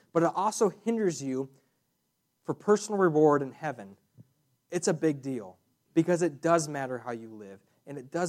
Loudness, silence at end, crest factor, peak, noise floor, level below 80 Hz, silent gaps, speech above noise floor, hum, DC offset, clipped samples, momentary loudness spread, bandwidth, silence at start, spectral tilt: -29 LUFS; 0 s; 20 dB; -10 dBFS; -77 dBFS; -80 dBFS; none; 49 dB; none; under 0.1%; under 0.1%; 19 LU; 14 kHz; 0.15 s; -5.5 dB/octave